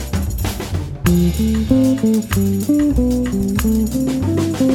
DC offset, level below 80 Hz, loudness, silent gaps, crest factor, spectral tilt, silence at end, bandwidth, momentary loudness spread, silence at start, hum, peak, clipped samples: under 0.1%; -26 dBFS; -17 LUFS; none; 14 dB; -6.5 dB/octave; 0 s; 19 kHz; 7 LU; 0 s; none; -2 dBFS; under 0.1%